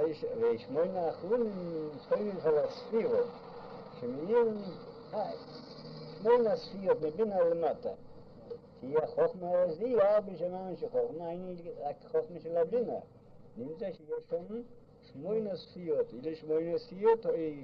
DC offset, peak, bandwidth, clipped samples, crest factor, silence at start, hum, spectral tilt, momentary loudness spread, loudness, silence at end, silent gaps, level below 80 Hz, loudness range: under 0.1%; -16 dBFS; 6 kHz; under 0.1%; 18 dB; 0 s; none; -8.5 dB/octave; 18 LU; -33 LUFS; 0 s; none; -68 dBFS; 5 LU